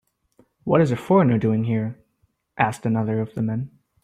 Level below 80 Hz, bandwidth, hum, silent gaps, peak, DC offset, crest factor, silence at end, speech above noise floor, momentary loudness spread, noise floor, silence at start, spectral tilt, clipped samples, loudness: -58 dBFS; 12 kHz; none; none; -4 dBFS; under 0.1%; 18 dB; 0.35 s; 48 dB; 12 LU; -68 dBFS; 0.65 s; -8.5 dB/octave; under 0.1%; -22 LUFS